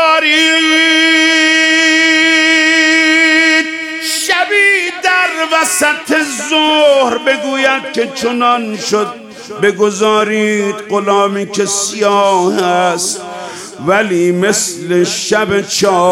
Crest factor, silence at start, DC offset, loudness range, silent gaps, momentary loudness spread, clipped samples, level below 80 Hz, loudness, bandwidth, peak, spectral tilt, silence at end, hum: 12 dB; 0 s; under 0.1%; 6 LU; none; 8 LU; under 0.1%; -58 dBFS; -10 LUFS; 17 kHz; 0 dBFS; -2.5 dB/octave; 0 s; none